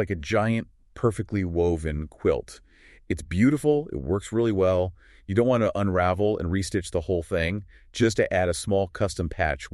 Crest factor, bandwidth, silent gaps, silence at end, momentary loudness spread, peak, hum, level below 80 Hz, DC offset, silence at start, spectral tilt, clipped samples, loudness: 16 dB; 12.5 kHz; none; 0.05 s; 8 LU; -8 dBFS; none; -42 dBFS; under 0.1%; 0 s; -6.5 dB/octave; under 0.1%; -25 LUFS